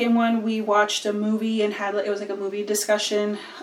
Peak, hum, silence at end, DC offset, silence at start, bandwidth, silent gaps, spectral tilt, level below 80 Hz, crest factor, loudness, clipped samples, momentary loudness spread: -8 dBFS; none; 0 s; under 0.1%; 0 s; 17.5 kHz; none; -3.5 dB/octave; -86 dBFS; 16 dB; -23 LUFS; under 0.1%; 7 LU